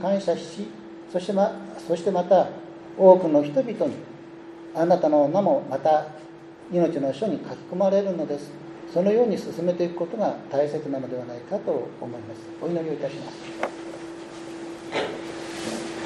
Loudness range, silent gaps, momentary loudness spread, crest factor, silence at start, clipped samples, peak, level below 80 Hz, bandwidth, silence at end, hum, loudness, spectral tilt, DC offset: 10 LU; none; 18 LU; 24 dB; 0 s; under 0.1%; -2 dBFS; -68 dBFS; 11.5 kHz; 0 s; none; -24 LUFS; -6.5 dB/octave; under 0.1%